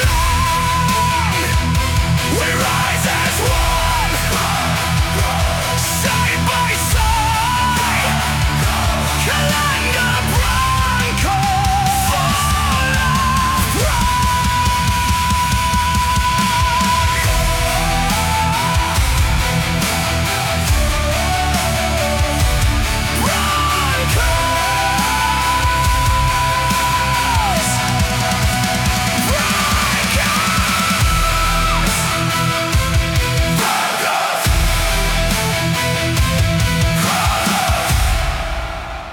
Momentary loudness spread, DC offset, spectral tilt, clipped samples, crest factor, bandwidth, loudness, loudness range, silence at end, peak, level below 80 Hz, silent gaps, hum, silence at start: 2 LU; under 0.1%; -3.5 dB/octave; under 0.1%; 12 dB; 18 kHz; -16 LUFS; 1 LU; 0 s; -4 dBFS; -22 dBFS; none; none; 0 s